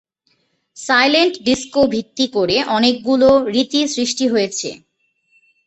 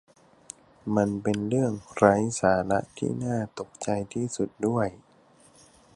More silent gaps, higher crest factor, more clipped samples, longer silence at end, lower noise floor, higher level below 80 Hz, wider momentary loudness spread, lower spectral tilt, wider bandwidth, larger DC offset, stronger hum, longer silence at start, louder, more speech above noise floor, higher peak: neither; second, 16 dB vs 24 dB; neither; about the same, 0.9 s vs 1 s; first, -64 dBFS vs -58 dBFS; first, -50 dBFS vs -56 dBFS; second, 7 LU vs 13 LU; second, -3 dB/octave vs -6 dB/octave; second, 8.4 kHz vs 11.5 kHz; neither; neither; about the same, 0.75 s vs 0.85 s; first, -16 LUFS vs -27 LUFS; first, 48 dB vs 32 dB; about the same, -2 dBFS vs -2 dBFS